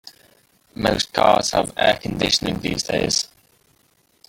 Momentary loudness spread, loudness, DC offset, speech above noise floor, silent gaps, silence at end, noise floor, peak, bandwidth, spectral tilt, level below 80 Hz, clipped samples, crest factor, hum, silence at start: 7 LU; -20 LUFS; under 0.1%; 42 dB; none; 1.05 s; -61 dBFS; -2 dBFS; 17 kHz; -3 dB/octave; -46 dBFS; under 0.1%; 20 dB; none; 0.05 s